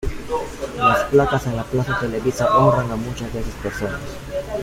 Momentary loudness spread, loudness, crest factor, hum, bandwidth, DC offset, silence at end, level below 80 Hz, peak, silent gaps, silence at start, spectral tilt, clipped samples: 13 LU; -20 LUFS; 18 dB; none; 16 kHz; under 0.1%; 0 s; -36 dBFS; -2 dBFS; none; 0 s; -6 dB/octave; under 0.1%